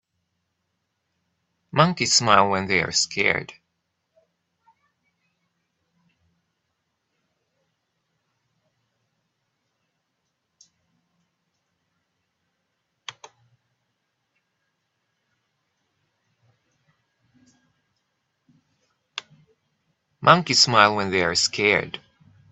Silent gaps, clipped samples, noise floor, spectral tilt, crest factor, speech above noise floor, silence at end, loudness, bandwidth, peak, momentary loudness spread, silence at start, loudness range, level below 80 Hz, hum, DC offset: none; under 0.1%; -77 dBFS; -2.5 dB/octave; 28 dB; 57 dB; 0.55 s; -19 LUFS; 8.2 kHz; 0 dBFS; 23 LU; 1.75 s; 26 LU; -64 dBFS; none; under 0.1%